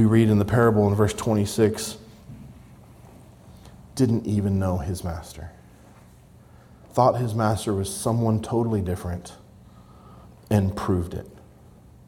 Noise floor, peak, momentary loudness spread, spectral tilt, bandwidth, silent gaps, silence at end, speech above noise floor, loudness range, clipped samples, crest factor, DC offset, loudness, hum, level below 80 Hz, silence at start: -50 dBFS; -4 dBFS; 21 LU; -7 dB/octave; 16.5 kHz; none; 0.7 s; 28 dB; 4 LU; under 0.1%; 20 dB; under 0.1%; -23 LUFS; none; -48 dBFS; 0 s